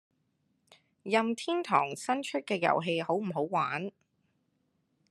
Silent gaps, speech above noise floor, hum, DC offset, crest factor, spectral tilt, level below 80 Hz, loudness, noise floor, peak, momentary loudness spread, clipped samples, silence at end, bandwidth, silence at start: none; 46 dB; none; under 0.1%; 22 dB; -5 dB/octave; -84 dBFS; -31 LUFS; -76 dBFS; -10 dBFS; 5 LU; under 0.1%; 1.2 s; 12.5 kHz; 1.05 s